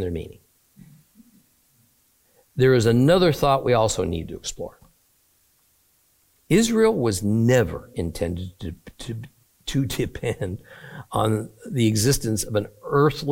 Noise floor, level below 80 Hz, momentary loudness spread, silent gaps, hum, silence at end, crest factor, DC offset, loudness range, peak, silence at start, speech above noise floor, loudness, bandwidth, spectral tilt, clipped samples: -63 dBFS; -44 dBFS; 19 LU; none; none; 0 s; 18 dB; under 0.1%; 7 LU; -6 dBFS; 0 s; 42 dB; -22 LUFS; 17 kHz; -5.5 dB/octave; under 0.1%